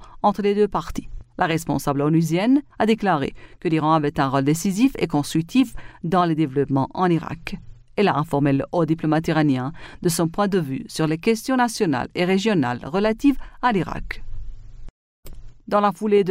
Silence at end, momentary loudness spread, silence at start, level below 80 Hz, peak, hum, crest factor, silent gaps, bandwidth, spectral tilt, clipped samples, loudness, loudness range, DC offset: 0 s; 11 LU; 0 s; -42 dBFS; -6 dBFS; none; 16 dB; 14.90-15.23 s; 16 kHz; -6 dB/octave; under 0.1%; -21 LUFS; 2 LU; under 0.1%